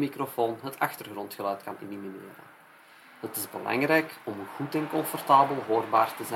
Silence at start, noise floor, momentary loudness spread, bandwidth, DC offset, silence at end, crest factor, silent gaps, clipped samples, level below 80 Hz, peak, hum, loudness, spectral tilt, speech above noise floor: 0 s; -54 dBFS; 17 LU; 16.5 kHz; under 0.1%; 0 s; 24 dB; none; under 0.1%; -80 dBFS; -6 dBFS; none; -28 LUFS; -4.5 dB/octave; 26 dB